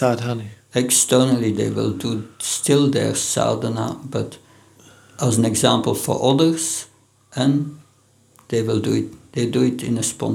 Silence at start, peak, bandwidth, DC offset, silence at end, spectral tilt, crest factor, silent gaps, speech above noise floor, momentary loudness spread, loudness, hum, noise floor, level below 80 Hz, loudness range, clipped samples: 0 s; 0 dBFS; 19 kHz; under 0.1%; 0 s; -4.5 dB/octave; 20 dB; none; 37 dB; 11 LU; -20 LUFS; none; -56 dBFS; -58 dBFS; 4 LU; under 0.1%